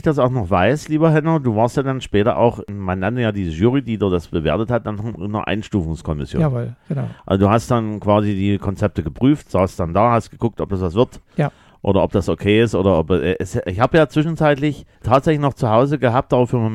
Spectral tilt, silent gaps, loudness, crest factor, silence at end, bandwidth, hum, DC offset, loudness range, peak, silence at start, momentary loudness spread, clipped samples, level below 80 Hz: -7.5 dB/octave; none; -18 LUFS; 18 dB; 0 s; 12.5 kHz; none; under 0.1%; 4 LU; 0 dBFS; 0.05 s; 8 LU; under 0.1%; -40 dBFS